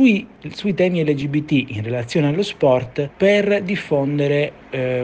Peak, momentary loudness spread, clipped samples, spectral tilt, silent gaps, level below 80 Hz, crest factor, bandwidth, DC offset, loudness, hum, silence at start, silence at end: -4 dBFS; 8 LU; under 0.1%; -7 dB/octave; none; -54 dBFS; 14 dB; 9.2 kHz; under 0.1%; -19 LUFS; none; 0 s; 0 s